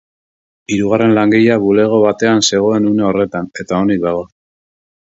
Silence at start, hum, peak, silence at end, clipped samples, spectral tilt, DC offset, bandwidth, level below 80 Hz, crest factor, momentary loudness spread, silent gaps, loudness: 0.7 s; none; 0 dBFS; 0.8 s; under 0.1%; -5 dB/octave; under 0.1%; 7.8 kHz; -48 dBFS; 14 dB; 8 LU; none; -13 LUFS